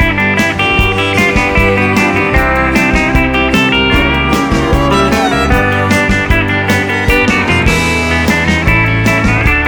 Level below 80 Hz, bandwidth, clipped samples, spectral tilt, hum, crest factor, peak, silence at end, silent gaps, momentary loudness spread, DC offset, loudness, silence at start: -20 dBFS; over 20 kHz; under 0.1%; -5 dB/octave; none; 10 dB; 0 dBFS; 0 s; none; 2 LU; under 0.1%; -10 LUFS; 0 s